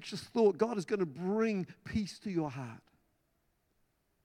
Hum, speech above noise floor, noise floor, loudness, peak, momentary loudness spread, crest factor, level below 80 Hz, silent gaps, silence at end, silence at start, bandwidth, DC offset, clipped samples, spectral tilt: none; 43 dB; -77 dBFS; -34 LUFS; -16 dBFS; 10 LU; 18 dB; -66 dBFS; none; 1.45 s; 0 s; 12.5 kHz; under 0.1%; under 0.1%; -6.5 dB/octave